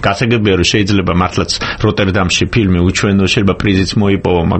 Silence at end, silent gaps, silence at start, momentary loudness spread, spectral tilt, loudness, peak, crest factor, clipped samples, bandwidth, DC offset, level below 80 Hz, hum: 0 s; none; 0 s; 3 LU; -5 dB/octave; -12 LUFS; 0 dBFS; 12 dB; under 0.1%; 8.8 kHz; under 0.1%; -30 dBFS; none